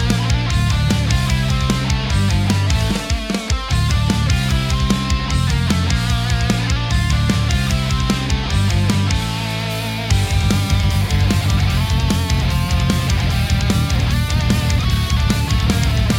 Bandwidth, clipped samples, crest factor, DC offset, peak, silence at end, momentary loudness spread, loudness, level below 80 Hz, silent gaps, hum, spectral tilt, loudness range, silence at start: 16.5 kHz; under 0.1%; 16 dB; under 0.1%; 0 dBFS; 0 s; 2 LU; -17 LUFS; -22 dBFS; none; none; -5 dB/octave; 1 LU; 0 s